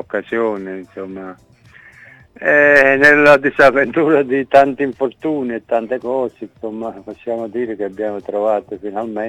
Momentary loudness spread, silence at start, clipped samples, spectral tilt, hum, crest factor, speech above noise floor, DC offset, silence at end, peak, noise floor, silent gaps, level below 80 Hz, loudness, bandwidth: 20 LU; 0.15 s; under 0.1%; -6 dB/octave; none; 16 dB; 28 dB; under 0.1%; 0 s; 0 dBFS; -43 dBFS; none; -52 dBFS; -14 LUFS; 11 kHz